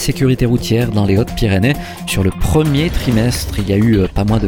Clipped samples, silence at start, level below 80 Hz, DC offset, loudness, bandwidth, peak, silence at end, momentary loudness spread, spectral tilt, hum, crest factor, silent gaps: under 0.1%; 0 s; -24 dBFS; under 0.1%; -15 LUFS; 18.5 kHz; 0 dBFS; 0 s; 4 LU; -6 dB/octave; none; 14 dB; none